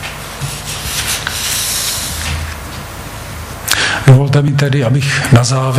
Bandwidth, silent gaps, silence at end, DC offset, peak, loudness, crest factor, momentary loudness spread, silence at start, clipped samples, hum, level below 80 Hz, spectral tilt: 16 kHz; none; 0 s; under 0.1%; 0 dBFS; -13 LUFS; 14 dB; 17 LU; 0 s; 0.4%; none; -32 dBFS; -4 dB/octave